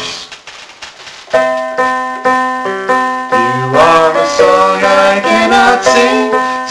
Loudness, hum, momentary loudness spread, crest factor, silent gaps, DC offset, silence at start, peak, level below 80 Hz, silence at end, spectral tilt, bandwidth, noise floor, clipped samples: -10 LUFS; none; 20 LU; 10 dB; none; under 0.1%; 0 s; 0 dBFS; -46 dBFS; 0 s; -3.5 dB/octave; 11 kHz; -32 dBFS; under 0.1%